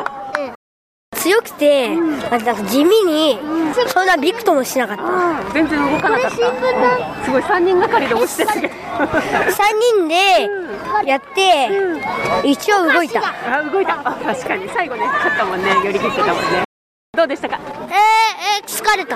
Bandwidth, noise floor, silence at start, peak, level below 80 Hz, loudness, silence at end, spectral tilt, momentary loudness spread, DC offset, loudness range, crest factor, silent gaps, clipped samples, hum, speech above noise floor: 15.5 kHz; under -90 dBFS; 0 s; -2 dBFS; -50 dBFS; -16 LUFS; 0 s; -3.5 dB/octave; 8 LU; under 0.1%; 2 LU; 14 dB; 0.55-1.12 s, 16.65-17.13 s; under 0.1%; none; over 74 dB